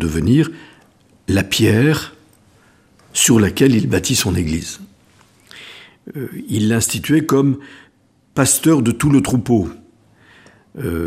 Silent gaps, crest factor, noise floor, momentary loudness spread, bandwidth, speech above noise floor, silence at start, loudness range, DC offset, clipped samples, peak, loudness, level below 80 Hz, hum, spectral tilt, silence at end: none; 18 dB; -55 dBFS; 18 LU; 15.5 kHz; 40 dB; 0 s; 4 LU; under 0.1%; under 0.1%; 0 dBFS; -16 LUFS; -40 dBFS; none; -4.5 dB/octave; 0 s